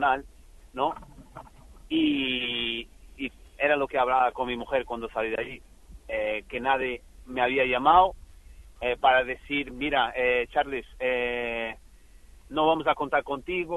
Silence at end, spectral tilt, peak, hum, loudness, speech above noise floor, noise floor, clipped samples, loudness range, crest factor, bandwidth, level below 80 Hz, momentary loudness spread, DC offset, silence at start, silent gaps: 0 s; -5 dB/octave; -6 dBFS; none; -26 LUFS; 25 dB; -51 dBFS; under 0.1%; 5 LU; 22 dB; 12 kHz; -50 dBFS; 14 LU; under 0.1%; 0 s; none